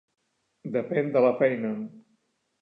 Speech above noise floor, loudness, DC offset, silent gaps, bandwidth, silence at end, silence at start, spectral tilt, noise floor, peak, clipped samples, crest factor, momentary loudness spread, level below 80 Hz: 47 dB; -26 LUFS; under 0.1%; none; 4.9 kHz; 0.6 s; 0.65 s; -9.5 dB/octave; -72 dBFS; -10 dBFS; under 0.1%; 18 dB; 16 LU; -80 dBFS